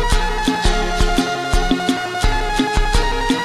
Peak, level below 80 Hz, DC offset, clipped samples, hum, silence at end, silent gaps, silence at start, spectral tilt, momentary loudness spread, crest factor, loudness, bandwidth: -2 dBFS; -20 dBFS; under 0.1%; under 0.1%; none; 0 s; none; 0 s; -4 dB/octave; 2 LU; 14 dB; -19 LUFS; 14 kHz